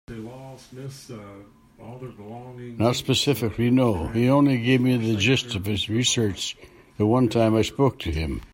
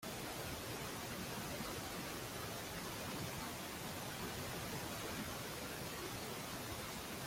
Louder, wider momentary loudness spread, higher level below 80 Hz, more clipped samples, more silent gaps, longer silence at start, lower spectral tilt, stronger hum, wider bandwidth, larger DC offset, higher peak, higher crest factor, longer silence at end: first, -22 LUFS vs -45 LUFS; first, 20 LU vs 1 LU; first, -46 dBFS vs -62 dBFS; neither; neither; about the same, 0.1 s vs 0 s; first, -5 dB/octave vs -3.5 dB/octave; neither; about the same, 16.5 kHz vs 16.5 kHz; neither; first, -8 dBFS vs -32 dBFS; about the same, 16 dB vs 14 dB; about the same, 0.05 s vs 0 s